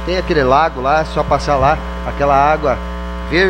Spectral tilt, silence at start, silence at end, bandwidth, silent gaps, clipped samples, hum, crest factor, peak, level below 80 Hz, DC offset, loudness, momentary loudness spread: -6 dB/octave; 0 s; 0 s; 10 kHz; none; under 0.1%; none; 14 dB; 0 dBFS; -26 dBFS; under 0.1%; -15 LUFS; 9 LU